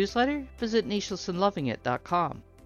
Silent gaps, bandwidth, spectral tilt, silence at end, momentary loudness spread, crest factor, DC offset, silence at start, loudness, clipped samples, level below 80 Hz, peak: none; 12 kHz; -5 dB/octave; 0.25 s; 5 LU; 18 dB; under 0.1%; 0 s; -29 LUFS; under 0.1%; -52 dBFS; -10 dBFS